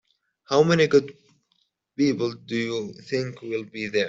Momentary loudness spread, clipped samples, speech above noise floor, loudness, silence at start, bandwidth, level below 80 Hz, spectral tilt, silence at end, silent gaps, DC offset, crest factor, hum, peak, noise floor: 13 LU; under 0.1%; 48 dB; -24 LUFS; 0.5 s; 7.8 kHz; -66 dBFS; -5.5 dB/octave; 0 s; none; under 0.1%; 20 dB; none; -6 dBFS; -71 dBFS